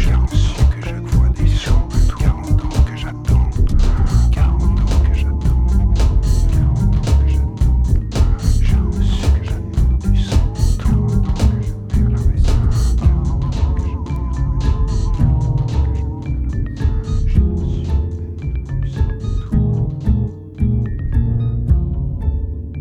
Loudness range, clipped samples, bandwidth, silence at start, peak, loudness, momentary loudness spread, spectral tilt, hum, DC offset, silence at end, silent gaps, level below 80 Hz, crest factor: 4 LU; under 0.1%; 10 kHz; 0 s; -2 dBFS; -18 LUFS; 6 LU; -7.5 dB/octave; none; under 0.1%; 0 s; none; -16 dBFS; 12 dB